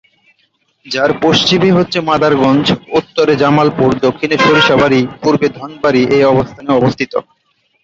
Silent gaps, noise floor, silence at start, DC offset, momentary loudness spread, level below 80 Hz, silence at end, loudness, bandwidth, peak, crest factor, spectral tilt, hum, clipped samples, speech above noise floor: none; -60 dBFS; 0.85 s; under 0.1%; 7 LU; -44 dBFS; 0.65 s; -12 LUFS; 7.8 kHz; 0 dBFS; 12 dB; -5.5 dB/octave; none; under 0.1%; 49 dB